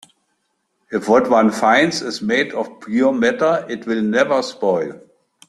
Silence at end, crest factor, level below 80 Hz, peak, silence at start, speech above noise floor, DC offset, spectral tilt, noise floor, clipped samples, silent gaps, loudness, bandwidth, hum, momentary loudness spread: 0.5 s; 16 dB; -60 dBFS; -2 dBFS; 0.9 s; 52 dB; under 0.1%; -4.5 dB/octave; -69 dBFS; under 0.1%; none; -17 LUFS; 12.5 kHz; none; 9 LU